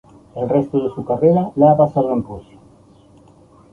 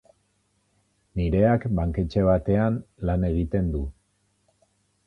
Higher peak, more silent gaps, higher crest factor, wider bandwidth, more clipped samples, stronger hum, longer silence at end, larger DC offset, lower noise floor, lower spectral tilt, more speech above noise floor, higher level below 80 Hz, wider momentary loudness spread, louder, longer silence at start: first, -2 dBFS vs -8 dBFS; neither; about the same, 16 dB vs 18 dB; second, 4.5 kHz vs 6 kHz; neither; second, none vs 50 Hz at -45 dBFS; first, 1.3 s vs 1.15 s; neither; second, -48 dBFS vs -69 dBFS; about the same, -11 dB/octave vs -10 dB/octave; second, 32 dB vs 46 dB; second, -50 dBFS vs -36 dBFS; first, 18 LU vs 8 LU; first, -17 LUFS vs -24 LUFS; second, 0.35 s vs 1.15 s